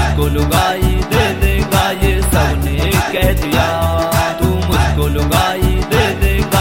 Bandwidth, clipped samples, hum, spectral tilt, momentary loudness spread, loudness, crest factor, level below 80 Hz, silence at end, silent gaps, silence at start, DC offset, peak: 16.5 kHz; under 0.1%; none; -5 dB/octave; 2 LU; -14 LUFS; 14 dB; -18 dBFS; 0 s; none; 0 s; under 0.1%; 0 dBFS